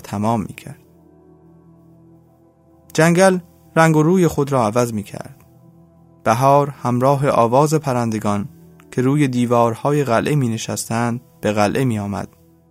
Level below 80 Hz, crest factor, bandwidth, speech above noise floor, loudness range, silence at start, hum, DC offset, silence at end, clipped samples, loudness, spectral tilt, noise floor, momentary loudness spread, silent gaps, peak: -54 dBFS; 18 dB; 16 kHz; 35 dB; 3 LU; 0.05 s; none; under 0.1%; 0.45 s; under 0.1%; -17 LUFS; -6 dB/octave; -52 dBFS; 13 LU; none; 0 dBFS